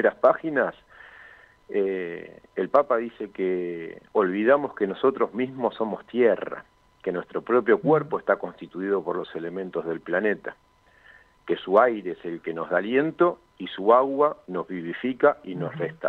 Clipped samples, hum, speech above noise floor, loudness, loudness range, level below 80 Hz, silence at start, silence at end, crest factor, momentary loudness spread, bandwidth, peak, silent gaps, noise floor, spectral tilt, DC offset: under 0.1%; none; 31 dB; -25 LUFS; 4 LU; -68 dBFS; 0 s; 0 s; 20 dB; 13 LU; 4.6 kHz; -6 dBFS; none; -55 dBFS; -8.5 dB/octave; under 0.1%